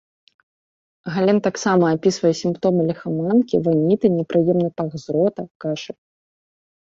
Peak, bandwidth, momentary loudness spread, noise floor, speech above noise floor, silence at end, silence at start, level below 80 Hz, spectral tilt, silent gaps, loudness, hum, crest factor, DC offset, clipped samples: -4 dBFS; 7.8 kHz; 10 LU; under -90 dBFS; over 71 dB; 0.9 s; 1.05 s; -60 dBFS; -6.5 dB/octave; 5.51-5.60 s; -20 LUFS; none; 16 dB; under 0.1%; under 0.1%